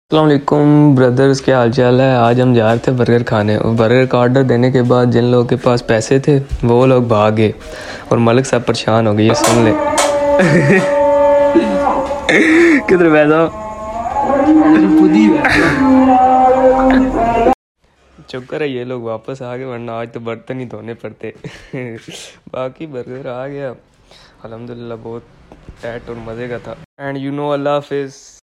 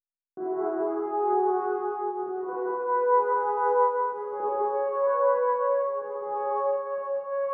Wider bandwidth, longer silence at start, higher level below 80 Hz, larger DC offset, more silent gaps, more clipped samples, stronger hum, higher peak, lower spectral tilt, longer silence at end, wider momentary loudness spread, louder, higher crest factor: first, 13 kHz vs 2.9 kHz; second, 0.1 s vs 0.35 s; first, -38 dBFS vs under -90 dBFS; neither; first, 17.54-17.75 s, 26.85-26.97 s vs none; neither; neither; first, 0 dBFS vs -12 dBFS; first, -6.5 dB/octave vs -5 dB/octave; first, 0.3 s vs 0 s; first, 18 LU vs 8 LU; first, -12 LUFS vs -27 LUFS; about the same, 12 dB vs 16 dB